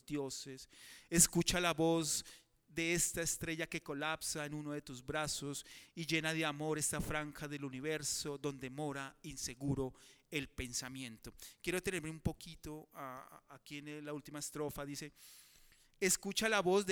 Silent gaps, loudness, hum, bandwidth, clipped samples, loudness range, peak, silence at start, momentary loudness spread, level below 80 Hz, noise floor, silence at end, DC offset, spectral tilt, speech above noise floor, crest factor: none; -38 LUFS; none; over 20 kHz; under 0.1%; 10 LU; -14 dBFS; 0.1 s; 17 LU; -60 dBFS; -66 dBFS; 0 s; under 0.1%; -3 dB/octave; 27 dB; 26 dB